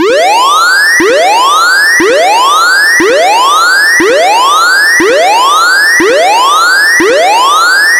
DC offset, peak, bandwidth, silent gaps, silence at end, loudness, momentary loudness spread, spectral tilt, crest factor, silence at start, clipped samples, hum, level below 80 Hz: under 0.1%; 0 dBFS; 18 kHz; none; 0 s; -5 LUFS; 2 LU; 0 dB/octave; 6 dB; 0 s; 0.2%; none; -48 dBFS